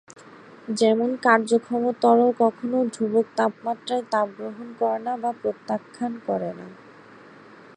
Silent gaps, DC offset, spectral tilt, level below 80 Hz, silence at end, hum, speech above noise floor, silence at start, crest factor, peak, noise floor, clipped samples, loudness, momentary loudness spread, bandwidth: none; under 0.1%; -5 dB/octave; -74 dBFS; 1 s; none; 24 dB; 0.35 s; 22 dB; -2 dBFS; -47 dBFS; under 0.1%; -23 LUFS; 13 LU; 10 kHz